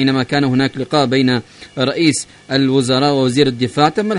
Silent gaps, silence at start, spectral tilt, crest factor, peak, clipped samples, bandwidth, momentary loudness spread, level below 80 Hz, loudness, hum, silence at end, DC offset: none; 0 s; -5 dB/octave; 16 dB; 0 dBFS; under 0.1%; 11 kHz; 6 LU; -52 dBFS; -15 LUFS; none; 0 s; under 0.1%